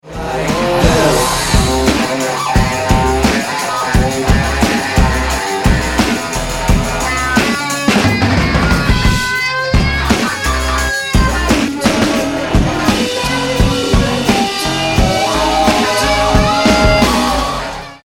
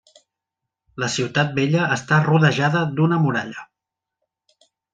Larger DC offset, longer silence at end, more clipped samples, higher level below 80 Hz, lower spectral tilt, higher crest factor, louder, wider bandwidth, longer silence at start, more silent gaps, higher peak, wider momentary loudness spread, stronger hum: neither; second, 0.1 s vs 1.3 s; neither; first, -20 dBFS vs -62 dBFS; second, -4.5 dB/octave vs -6 dB/octave; second, 12 dB vs 20 dB; first, -13 LUFS vs -19 LUFS; first, 17.5 kHz vs 9 kHz; second, 0.05 s vs 0.95 s; neither; about the same, 0 dBFS vs -2 dBFS; second, 4 LU vs 11 LU; neither